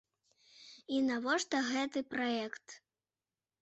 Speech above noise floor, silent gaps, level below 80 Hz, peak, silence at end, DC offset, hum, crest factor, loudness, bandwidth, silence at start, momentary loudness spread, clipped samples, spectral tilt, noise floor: over 55 dB; none; -80 dBFS; -20 dBFS; 0.85 s; under 0.1%; none; 16 dB; -35 LUFS; 8.2 kHz; 0.6 s; 21 LU; under 0.1%; -2.5 dB/octave; under -90 dBFS